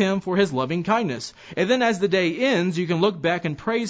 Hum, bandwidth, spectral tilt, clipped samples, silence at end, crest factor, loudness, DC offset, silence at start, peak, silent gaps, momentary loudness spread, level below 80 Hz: none; 8 kHz; -5.5 dB/octave; under 0.1%; 0 s; 16 dB; -22 LUFS; under 0.1%; 0 s; -6 dBFS; none; 6 LU; -60 dBFS